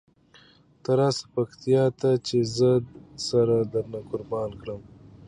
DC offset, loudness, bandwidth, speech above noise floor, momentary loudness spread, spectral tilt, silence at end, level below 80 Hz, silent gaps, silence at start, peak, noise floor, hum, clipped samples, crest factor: under 0.1%; -25 LUFS; 10.5 kHz; 32 dB; 14 LU; -6.5 dB/octave; 0.4 s; -58 dBFS; none; 0.9 s; -10 dBFS; -56 dBFS; none; under 0.1%; 16 dB